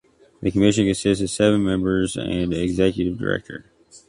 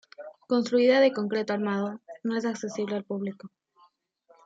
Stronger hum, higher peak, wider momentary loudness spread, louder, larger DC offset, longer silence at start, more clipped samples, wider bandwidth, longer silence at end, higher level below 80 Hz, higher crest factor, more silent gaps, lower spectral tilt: neither; first, -4 dBFS vs -10 dBFS; second, 9 LU vs 15 LU; first, -21 LUFS vs -27 LUFS; neither; first, 0.4 s vs 0.2 s; neither; first, 11.5 kHz vs 7.8 kHz; second, 0.1 s vs 1 s; first, -42 dBFS vs -80 dBFS; about the same, 18 dB vs 18 dB; neither; about the same, -5.5 dB/octave vs -5.5 dB/octave